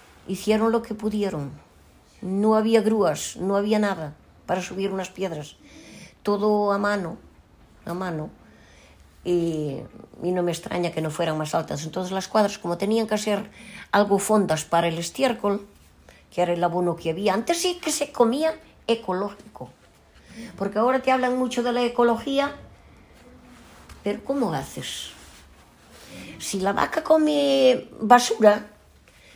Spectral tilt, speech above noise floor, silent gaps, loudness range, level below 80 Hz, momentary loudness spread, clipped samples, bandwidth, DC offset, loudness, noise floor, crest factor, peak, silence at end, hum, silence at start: -4.5 dB/octave; 30 dB; none; 6 LU; -56 dBFS; 17 LU; under 0.1%; 16 kHz; under 0.1%; -24 LUFS; -54 dBFS; 22 dB; -2 dBFS; 0.65 s; none; 0.3 s